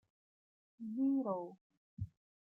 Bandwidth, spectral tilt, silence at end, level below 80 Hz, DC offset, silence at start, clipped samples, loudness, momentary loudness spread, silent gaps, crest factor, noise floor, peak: 1.3 kHz; -12.5 dB/octave; 0.45 s; -70 dBFS; under 0.1%; 0.8 s; under 0.1%; -40 LUFS; 15 LU; 1.61-1.70 s, 1.77-1.97 s; 16 dB; under -90 dBFS; -26 dBFS